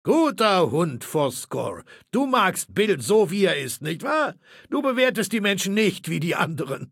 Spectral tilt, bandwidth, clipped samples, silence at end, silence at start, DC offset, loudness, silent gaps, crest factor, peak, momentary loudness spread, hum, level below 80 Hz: -4.5 dB/octave; 17 kHz; under 0.1%; 0.05 s; 0.05 s; under 0.1%; -23 LUFS; none; 16 dB; -6 dBFS; 9 LU; none; -68 dBFS